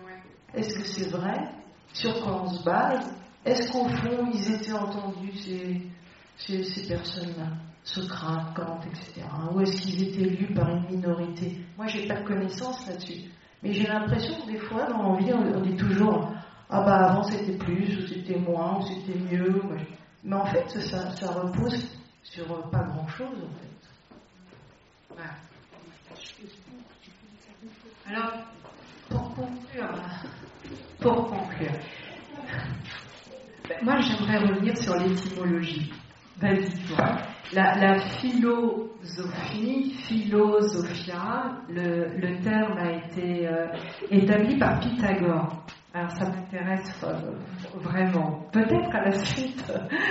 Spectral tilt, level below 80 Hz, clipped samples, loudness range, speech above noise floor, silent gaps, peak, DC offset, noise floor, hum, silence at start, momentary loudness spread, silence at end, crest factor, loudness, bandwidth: -5 dB/octave; -54 dBFS; under 0.1%; 11 LU; 29 dB; none; -8 dBFS; under 0.1%; -56 dBFS; none; 0 s; 17 LU; 0 s; 20 dB; -28 LUFS; 8 kHz